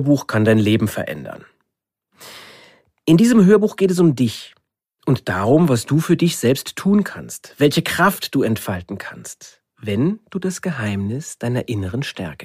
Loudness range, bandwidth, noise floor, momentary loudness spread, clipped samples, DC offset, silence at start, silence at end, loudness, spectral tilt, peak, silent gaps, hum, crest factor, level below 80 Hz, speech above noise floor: 8 LU; 15.5 kHz; -80 dBFS; 18 LU; under 0.1%; under 0.1%; 0 s; 0 s; -18 LUFS; -6 dB/octave; -2 dBFS; none; none; 18 dB; -54 dBFS; 62 dB